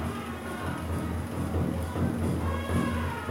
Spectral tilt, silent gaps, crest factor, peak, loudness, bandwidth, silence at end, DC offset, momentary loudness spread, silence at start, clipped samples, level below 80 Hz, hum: -6.5 dB/octave; none; 14 dB; -16 dBFS; -31 LUFS; 16 kHz; 0 s; under 0.1%; 5 LU; 0 s; under 0.1%; -40 dBFS; none